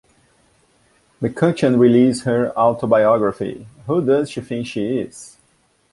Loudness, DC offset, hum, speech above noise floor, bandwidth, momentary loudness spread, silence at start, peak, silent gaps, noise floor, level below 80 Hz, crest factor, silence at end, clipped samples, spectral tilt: -18 LUFS; under 0.1%; none; 43 dB; 11.5 kHz; 14 LU; 1.2 s; -2 dBFS; none; -60 dBFS; -56 dBFS; 16 dB; 0.65 s; under 0.1%; -7 dB/octave